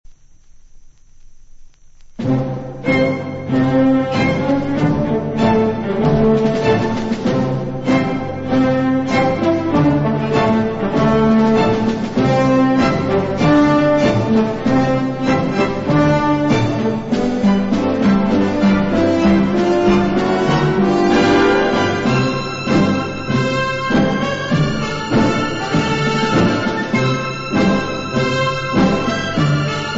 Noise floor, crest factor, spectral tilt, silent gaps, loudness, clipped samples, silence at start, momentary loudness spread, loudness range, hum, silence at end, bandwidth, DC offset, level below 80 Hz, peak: -42 dBFS; 14 dB; -6.5 dB/octave; none; -16 LUFS; under 0.1%; 0.1 s; 6 LU; 3 LU; none; 0 s; 8 kHz; under 0.1%; -38 dBFS; -2 dBFS